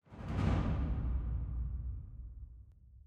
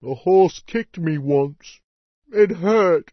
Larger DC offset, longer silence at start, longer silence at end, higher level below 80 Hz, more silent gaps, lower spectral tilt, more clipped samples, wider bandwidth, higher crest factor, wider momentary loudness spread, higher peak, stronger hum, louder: neither; about the same, 0.1 s vs 0 s; about the same, 0.05 s vs 0.1 s; first, -40 dBFS vs -58 dBFS; second, none vs 1.84-2.22 s; about the same, -8.5 dB/octave vs -7.5 dB/octave; neither; about the same, 7 kHz vs 6.4 kHz; about the same, 18 dB vs 16 dB; first, 19 LU vs 11 LU; second, -20 dBFS vs -4 dBFS; neither; second, -38 LUFS vs -19 LUFS